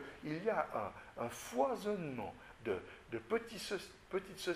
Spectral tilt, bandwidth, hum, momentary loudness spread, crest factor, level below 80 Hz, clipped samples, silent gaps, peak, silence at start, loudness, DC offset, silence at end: -4.5 dB/octave; 15.5 kHz; none; 10 LU; 20 dB; -68 dBFS; under 0.1%; none; -22 dBFS; 0 s; -41 LUFS; under 0.1%; 0 s